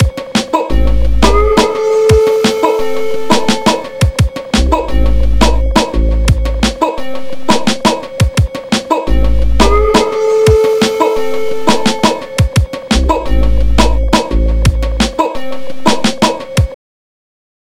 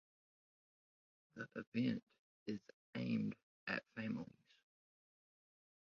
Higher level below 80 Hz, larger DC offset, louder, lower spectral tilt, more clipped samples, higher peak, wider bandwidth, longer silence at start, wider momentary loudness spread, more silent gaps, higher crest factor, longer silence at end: first, -16 dBFS vs -82 dBFS; first, 7% vs under 0.1%; first, -13 LUFS vs -45 LUFS; about the same, -5 dB/octave vs -5.5 dB/octave; first, 0.6% vs under 0.1%; first, 0 dBFS vs -26 dBFS; first, 15.5 kHz vs 6.8 kHz; second, 0 s vs 1.35 s; second, 6 LU vs 13 LU; second, none vs 1.67-1.72 s, 2.03-2.07 s, 2.19-2.46 s, 2.73-2.93 s, 3.43-3.67 s; second, 12 dB vs 22 dB; second, 1 s vs 1.6 s